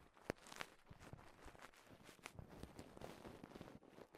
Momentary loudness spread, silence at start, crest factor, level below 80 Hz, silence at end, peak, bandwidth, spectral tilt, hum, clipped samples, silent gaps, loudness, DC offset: 10 LU; 0 s; 36 dB; -70 dBFS; 0 s; -22 dBFS; 15.5 kHz; -4.5 dB/octave; none; under 0.1%; none; -58 LUFS; under 0.1%